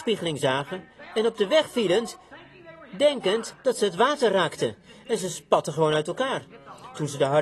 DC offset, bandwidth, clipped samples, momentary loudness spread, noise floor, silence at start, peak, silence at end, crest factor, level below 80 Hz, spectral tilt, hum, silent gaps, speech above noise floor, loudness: under 0.1%; 12.5 kHz; under 0.1%; 15 LU; -47 dBFS; 0 s; -6 dBFS; 0 s; 20 dB; -66 dBFS; -4.5 dB/octave; none; none; 23 dB; -25 LUFS